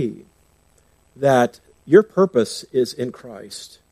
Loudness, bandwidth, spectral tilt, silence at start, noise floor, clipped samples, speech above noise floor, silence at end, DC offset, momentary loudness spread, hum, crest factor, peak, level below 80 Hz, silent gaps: -19 LUFS; 15 kHz; -6 dB/octave; 0 s; -58 dBFS; under 0.1%; 39 dB; 0.25 s; under 0.1%; 20 LU; none; 20 dB; 0 dBFS; -64 dBFS; none